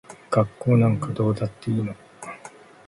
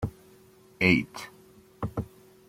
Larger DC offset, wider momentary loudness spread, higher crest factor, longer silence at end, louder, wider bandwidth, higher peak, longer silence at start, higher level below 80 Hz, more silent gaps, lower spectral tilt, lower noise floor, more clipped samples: neither; about the same, 19 LU vs 20 LU; second, 18 dB vs 24 dB; about the same, 0.4 s vs 0.45 s; first, -23 LUFS vs -27 LUFS; second, 11.5 kHz vs 16.5 kHz; about the same, -6 dBFS vs -6 dBFS; about the same, 0.1 s vs 0 s; about the same, -54 dBFS vs -52 dBFS; neither; first, -8.5 dB/octave vs -6 dB/octave; second, -46 dBFS vs -56 dBFS; neither